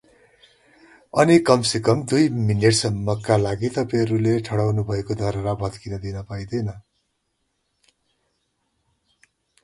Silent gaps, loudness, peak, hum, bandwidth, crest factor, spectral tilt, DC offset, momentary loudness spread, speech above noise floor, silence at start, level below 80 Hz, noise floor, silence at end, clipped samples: none; -21 LUFS; 0 dBFS; none; 11.5 kHz; 22 dB; -5.5 dB/octave; under 0.1%; 13 LU; 53 dB; 1.15 s; -48 dBFS; -73 dBFS; 2.85 s; under 0.1%